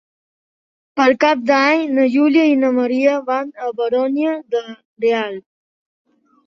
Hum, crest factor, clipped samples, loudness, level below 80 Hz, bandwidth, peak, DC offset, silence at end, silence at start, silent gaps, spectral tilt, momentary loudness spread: none; 16 dB; under 0.1%; -16 LUFS; -66 dBFS; 7.2 kHz; -2 dBFS; under 0.1%; 1.05 s; 0.95 s; 4.85-4.96 s; -4.5 dB/octave; 11 LU